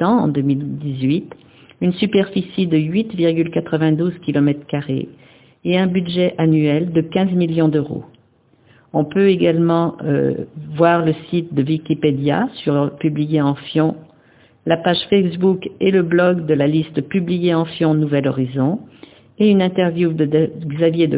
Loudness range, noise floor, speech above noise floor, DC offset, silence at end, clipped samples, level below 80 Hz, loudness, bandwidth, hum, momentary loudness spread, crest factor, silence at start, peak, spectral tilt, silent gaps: 2 LU; -55 dBFS; 38 dB; under 0.1%; 0 s; under 0.1%; -54 dBFS; -18 LUFS; 4 kHz; none; 7 LU; 16 dB; 0 s; 0 dBFS; -11.5 dB/octave; none